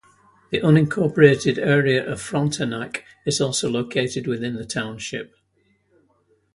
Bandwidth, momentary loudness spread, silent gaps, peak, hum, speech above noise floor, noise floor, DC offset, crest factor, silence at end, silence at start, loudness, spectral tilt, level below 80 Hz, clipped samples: 11.5 kHz; 14 LU; none; 0 dBFS; none; 44 dB; -65 dBFS; under 0.1%; 22 dB; 1.3 s; 0.5 s; -21 LUFS; -5.5 dB/octave; -56 dBFS; under 0.1%